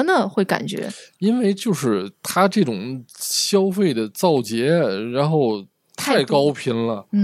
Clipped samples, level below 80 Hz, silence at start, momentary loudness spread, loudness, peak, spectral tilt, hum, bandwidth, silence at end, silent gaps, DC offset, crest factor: under 0.1%; -70 dBFS; 0 s; 10 LU; -20 LUFS; -2 dBFS; -5 dB/octave; none; 16 kHz; 0 s; none; under 0.1%; 18 dB